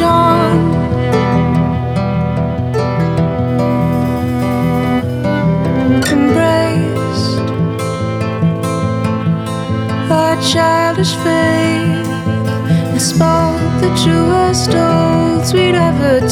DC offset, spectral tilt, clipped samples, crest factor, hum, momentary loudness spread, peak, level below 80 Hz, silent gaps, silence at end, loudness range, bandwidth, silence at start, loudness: under 0.1%; -6 dB/octave; under 0.1%; 12 dB; none; 5 LU; 0 dBFS; -34 dBFS; none; 0 s; 3 LU; 16 kHz; 0 s; -13 LUFS